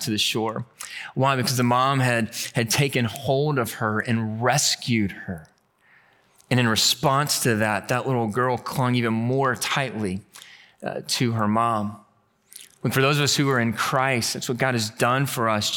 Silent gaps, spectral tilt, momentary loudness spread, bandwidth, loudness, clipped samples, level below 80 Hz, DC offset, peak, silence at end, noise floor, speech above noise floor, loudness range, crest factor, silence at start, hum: none; -4 dB/octave; 10 LU; 19 kHz; -22 LUFS; under 0.1%; -64 dBFS; under 0.1%; -6 dBFS; 0 s; -59 dBFS; 36 dB; 3 LU; 18 dB; 0 s; none